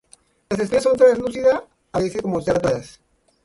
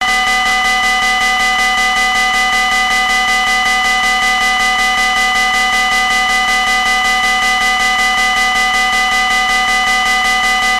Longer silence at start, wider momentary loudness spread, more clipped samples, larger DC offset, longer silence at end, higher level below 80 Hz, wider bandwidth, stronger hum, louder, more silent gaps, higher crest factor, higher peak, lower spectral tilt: first, 0.5 s vs 0 s; first, 12 LU vs 0 LU; neither; neither; first, 0.55 s vs 0 s; second, -50 dBFS vs -34 dBFS; second, 11.5 kHz vs 14 kHz; neither; second, -20 LUFS vs -11 LUFS; neither; first, 18 dB vs 6 dB; first, -2 dBFS vs -6 dBFS; first, -6 dB/octave vs 0.5 dB/octave